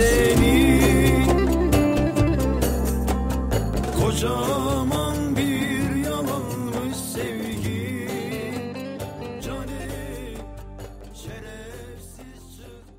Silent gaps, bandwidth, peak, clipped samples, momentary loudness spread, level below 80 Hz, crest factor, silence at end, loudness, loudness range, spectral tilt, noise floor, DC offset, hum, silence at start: none; 16 kHz; -6 dBFS; under 0.1%; 22 LU; -30 dBFS; 18 dB; 0.15 s; -23 LUFS; 15 LU; -5.5 dB/octave; -43 dBFS; under 0.1%; none; 0 s